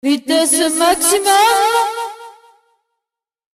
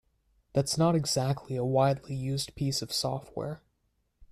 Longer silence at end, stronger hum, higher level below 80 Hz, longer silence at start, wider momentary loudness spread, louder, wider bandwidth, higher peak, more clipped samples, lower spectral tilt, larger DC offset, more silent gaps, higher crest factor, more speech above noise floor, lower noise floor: first, 1.25 s vs 0.05 s; neither; first, -52 dBFS vs -58 dBFS; second, 0.05 s vs 0.55 s; about the same, 9 LU vs 11 LU; first, -13 LUFS vs -30 LUFS; first, 15.5 kHz vs 14 kHz; first, 0 dBFS vs -12 dBFS; neither; second, 0 dB/octave vs -5 dB/octave; neither; neither; about the same, 16 dB vs 18 dB; first, 69 dB vs 46 dB; first, -82 dBFS vs -75 dBFS